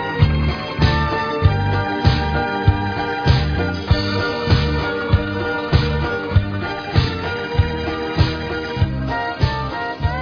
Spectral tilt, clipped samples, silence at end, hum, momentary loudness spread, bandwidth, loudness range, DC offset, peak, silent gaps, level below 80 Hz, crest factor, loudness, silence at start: -7.5 dB/octave; under 0.1%; 0 s; none; 5 LU; 5.4 kHz; 2 LU; under 0.1%; -2 dBFS; none; -26 dBFS; 18 dB; -19 LUFS; 0 s